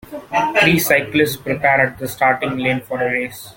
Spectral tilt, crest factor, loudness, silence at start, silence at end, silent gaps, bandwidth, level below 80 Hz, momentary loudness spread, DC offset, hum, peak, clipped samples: -4.5 dB/octave; 18 dB; -17 LUFS; 0.05 s; 0.05 s; none; 17 kHz; -50 dBFS; 7 LU; under 0.1%; none; 0 dBFS; under 0.1%